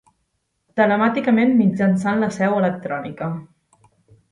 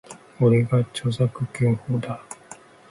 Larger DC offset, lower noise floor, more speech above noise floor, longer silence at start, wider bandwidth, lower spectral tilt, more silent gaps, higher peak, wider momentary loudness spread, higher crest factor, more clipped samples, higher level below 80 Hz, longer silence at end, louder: neither; first, -71 dBFS vs -46 dBFS; first, 53 dB vs 25 dB; first, 0.75 s vs 0.1 s; about the same, 11 kHz vs 11.5 kHz; about the same, -7.5 dB/octave vs -7.5 dB/octave; neither; first, -4 dBFS vs -8 dBFS; second, 12 LU vs 16 LU; about the same, 16 dB vs 16 dB; neither; second, -62 dBFS vs -56 dBFS; first, 0.9 s vs 0.35 s; first, -19 LUFS vs -23 LUFS